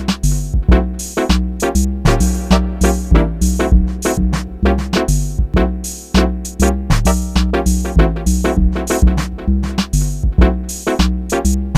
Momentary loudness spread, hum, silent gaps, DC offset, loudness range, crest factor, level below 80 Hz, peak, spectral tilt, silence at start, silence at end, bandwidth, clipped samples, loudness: 4 LU; none; none; under 0.1%; 1 LU; 14 dB; -16 dBFS; 0 dBFS; -5.5 dB/octave; 0 s; 0 s; 15.5 kHz; under 0.1%; -16 LUFS